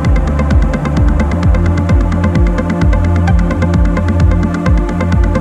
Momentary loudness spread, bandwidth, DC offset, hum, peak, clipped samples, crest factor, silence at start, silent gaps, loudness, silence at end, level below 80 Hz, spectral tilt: 2 LU; 8.6 kHz; under 0.1%; none; 0 dBFS; under 0.1%; 10 dB; 0 s; none; -13 LUFS; 0 s; -14 dBFS; -8 dB/octave